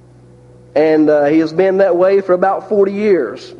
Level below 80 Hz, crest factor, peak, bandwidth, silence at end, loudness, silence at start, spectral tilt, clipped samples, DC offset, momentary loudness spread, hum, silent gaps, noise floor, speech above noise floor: -58 dBFS; 12 dB; 0 dBFS; 7.2 kHz; 0.05 s; -13 LUFS; 0.75 s; -7.5 dB/octave; under 0.1%; under 0.1%; 4 LU; none; none; -42 dBFS; 30 dB